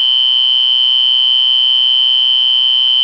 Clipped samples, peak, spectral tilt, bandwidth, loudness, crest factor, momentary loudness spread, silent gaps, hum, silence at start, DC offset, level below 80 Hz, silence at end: under 0.1%; -4 dBFS; 2 dB/octave; 5.4 kHz; -8 LUFS; 6 dB; 0 LU; none; none; 0 s; 0.4%; -72 dBFS; 0 s